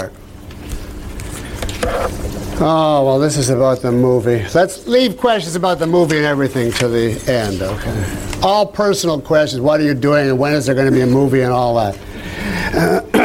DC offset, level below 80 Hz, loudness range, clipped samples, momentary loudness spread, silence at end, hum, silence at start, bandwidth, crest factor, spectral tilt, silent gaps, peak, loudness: under 0.1%; -34 dBFS; 3 LU; under 0.1%; 14 LU; 0 s; none; 0 s; 16.5 kHz; 14 dB; -5.5 dB/octave; none; -2 dBFS; -15 LUFS